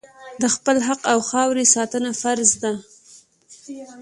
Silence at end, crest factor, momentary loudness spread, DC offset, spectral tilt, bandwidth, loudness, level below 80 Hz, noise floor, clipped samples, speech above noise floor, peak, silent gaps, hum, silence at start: 0 s; 20 dB; 17 LU; under 0.1%; -2 dB/octave; 11.5 kHz; -19 LUFS; -64 dBFS; -50 dBFS; under 0.1%; 30 dB; -2 dBFS; none; none; 0.2 s